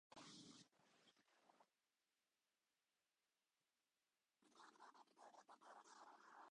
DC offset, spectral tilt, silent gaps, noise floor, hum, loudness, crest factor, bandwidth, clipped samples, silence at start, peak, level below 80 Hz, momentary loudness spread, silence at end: under 0.1%; -2.5 dB/octave; none; under -90 dBFS; none; -66 LUFS; 20 dB; 10 kHz; under 0.1%; 0.1 s; -50 dBFS; under -90 dBFS; 6 LU; 0 s